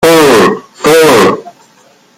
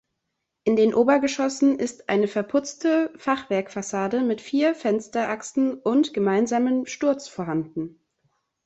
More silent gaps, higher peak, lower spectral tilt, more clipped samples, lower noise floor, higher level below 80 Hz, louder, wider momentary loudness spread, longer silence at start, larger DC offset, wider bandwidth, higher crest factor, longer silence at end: neither; first, 0 dBFS vs -6 dBFS; about the same, -4 dB/octave vs -5 dB/octave; neither; second, -44 dBFS vs -80 dBFS; first, -44 dBFS vs -66 dBFS; first, -6 LUFS vs -23 LUFS; about the same, 8 LU vs 8 LU; second, 0 s vs 0.65 s; neither; first, 16.5 kHz vs 8.2 kHz; second, 8 dB vs 16 dB; about the same, 0.7 s vs 0.75 s